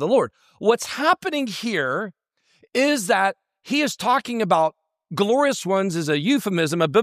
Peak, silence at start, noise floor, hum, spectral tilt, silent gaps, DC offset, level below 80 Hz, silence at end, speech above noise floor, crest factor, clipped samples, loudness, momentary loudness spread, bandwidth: -4 dBFS; 0 s; -61 dBFS; none; -4.5 dB/octave; none; under 0.1%; -70 dBFS; 0 s; 40 dB; 18 dB; under 0.1%; -21 LUFS; 6 LU; 15.5 kHz